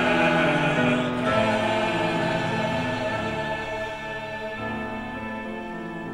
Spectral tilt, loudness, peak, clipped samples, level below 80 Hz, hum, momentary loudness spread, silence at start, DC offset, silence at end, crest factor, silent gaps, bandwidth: -5.5 dB/octave; -25 LUFS; -10 dBFS; under 0.1%; -48 dBFS; none; 11 LU; 0 s; under 0.1%; 0 s; 16 dB; none; 13 kHz